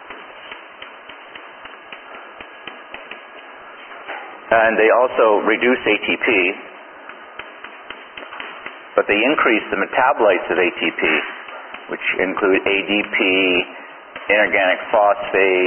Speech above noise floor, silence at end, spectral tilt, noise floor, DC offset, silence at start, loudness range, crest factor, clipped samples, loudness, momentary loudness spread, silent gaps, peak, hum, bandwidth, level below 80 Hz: 22 dB; 0 s; -9 dB/octave; -38 dBFS; under 0.1%; 0 s; 18 LU; 20 dB; under 0.1%; -16 LUFS; 22 LU; none; 0 dBFS; none; 3.4 kHz; -58 dBFS